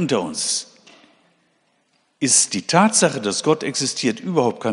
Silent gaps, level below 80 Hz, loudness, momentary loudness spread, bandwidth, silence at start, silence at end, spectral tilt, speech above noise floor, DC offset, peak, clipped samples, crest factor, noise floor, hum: none; -68 dBFS; -18 LUFS; 7 LU; 11 kHz; 0 s; 0 s; -3 dB/octave; 45 dB; under 0.1%; 0 dBFS; under 0.1%; 20 dB; -65 dBFS; none